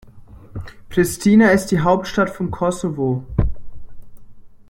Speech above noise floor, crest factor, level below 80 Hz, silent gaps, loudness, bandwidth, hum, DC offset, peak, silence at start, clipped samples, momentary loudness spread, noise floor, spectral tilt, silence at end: 24 dB; 18 dB; -34 dBFS; none; -18 LUFS; 16.5 kHz; none; under 0.1%; -2 dBFS; 0.05 s; under 0.1%; 20 LU; -41 dBFS; -6 dB/octave; 0.1 s